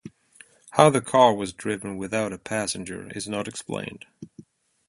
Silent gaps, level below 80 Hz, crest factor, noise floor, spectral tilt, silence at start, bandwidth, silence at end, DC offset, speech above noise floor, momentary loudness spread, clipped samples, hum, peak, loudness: none; -60 dBFS; 26 dB; -54 dBFS; -4.5 dB/octave; 0.05 s; 11.5 kHz; 0.45 s; under 0.1%; 30 dB; 16 LU; under 0.1%; none; 0 dBFS; -24 LUFS